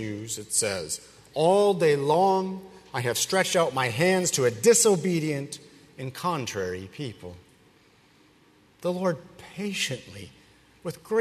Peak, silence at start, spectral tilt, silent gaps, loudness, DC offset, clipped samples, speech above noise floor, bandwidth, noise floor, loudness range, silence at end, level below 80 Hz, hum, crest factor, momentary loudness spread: -8 dBFS; 0 s; -3.5 dB/octave; none; -25 LUFS; under 0.1%; under 0.1%; 34 dB; 13.5 kHz; -59 dBFS; 11 LU; 0 s; -66 dBFS; none; 18 dB; 18 LU